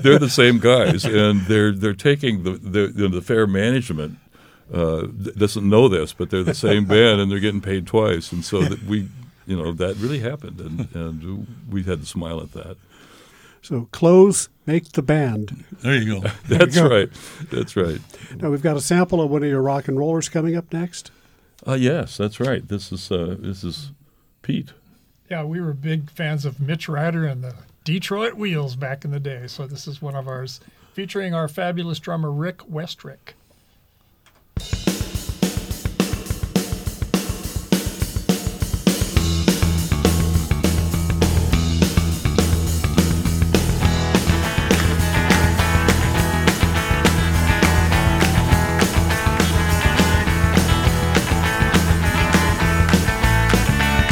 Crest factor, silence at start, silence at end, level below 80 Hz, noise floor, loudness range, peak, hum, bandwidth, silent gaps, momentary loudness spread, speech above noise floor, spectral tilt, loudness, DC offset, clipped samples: 20 dB; 0 s; 0 s; -28 dBFS; -57 dBFS; 10 LU; 0 dBFS; none; 18 kHz; none; 14 LU; 37 dB; -5.5 dB/octave; -19 LUFS; under 0.1%; under 0.1%